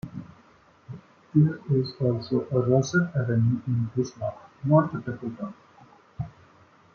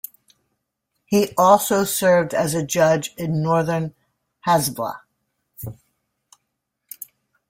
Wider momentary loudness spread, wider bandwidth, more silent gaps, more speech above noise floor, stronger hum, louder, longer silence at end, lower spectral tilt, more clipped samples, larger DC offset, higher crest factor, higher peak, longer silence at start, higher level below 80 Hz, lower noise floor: second, 17 LU vs 21 LU; second, 7 kHz vs 16.5 kHz; neither; second, 33 dB vs 59 dB; neither; second, -25 LUFS vs -19 LUFS; first, 0.65 s vs 0.45 s; first, -8 dB/octave vs -5 dB/octave; neither; neither; about the same, 20 dB vs 20 dB; second, -8 dBFS vs -2 dBFS; second, 0.05 s vs 1.1 s; about the same, -60 dBFS vs -58 dBFS; second, -57 dBFS vs -77 dBFS